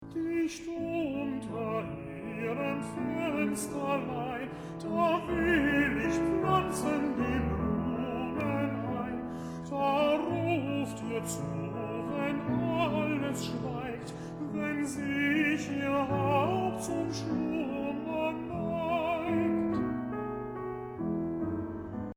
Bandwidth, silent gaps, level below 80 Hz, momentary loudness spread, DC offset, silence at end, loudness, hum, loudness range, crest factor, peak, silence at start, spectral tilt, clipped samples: over 20 kHz; none; -52 dBFS; 9 LU; under 0.1%; 0.05 s; -32 LUFS; none; 4 LU; 18 dB; -14 dBFS; 0 s; -6 dB/octave; under 0.1%